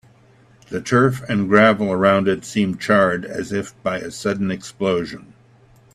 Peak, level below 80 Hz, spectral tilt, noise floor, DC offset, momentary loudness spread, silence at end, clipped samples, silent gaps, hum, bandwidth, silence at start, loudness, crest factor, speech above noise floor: 0 dBFS; -56 dBFS; -6 dB/octave; -51 dBFS; under 0.1%; 11 LU; 0.7 s; under 0.1%; none; none; 13 kHz; 0.7 s; -19 LUFS; 20 dB; 33 dB